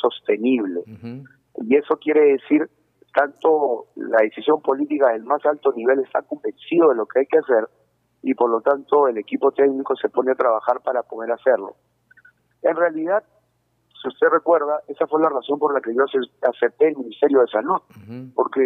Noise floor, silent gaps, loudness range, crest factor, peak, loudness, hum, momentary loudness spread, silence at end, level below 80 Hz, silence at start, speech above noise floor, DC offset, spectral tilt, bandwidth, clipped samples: -67 dBFS; none; 3 LU; 16 dB; -4 dBFS; -20 LUFS; none; 11 LU; 0 s; -78 dBFS; 0.05 s; 48 dB; under 0.1%; -8 dB/octave; 3.9 kHz; under 0.1%